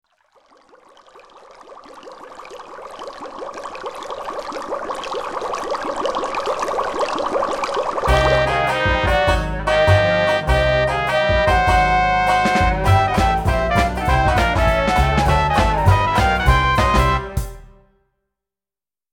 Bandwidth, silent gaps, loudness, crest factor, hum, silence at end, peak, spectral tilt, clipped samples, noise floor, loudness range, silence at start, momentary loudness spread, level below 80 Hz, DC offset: 17.5 kHz; none; -17 LUFS; 18 dB; none; 1.45 s; -2 dBFS; -5.5 dB/octave; under 0.1%; under -90 dBFS; 15 LU; 1.15 s; 15 LU; -26 dBFS; under 0.1%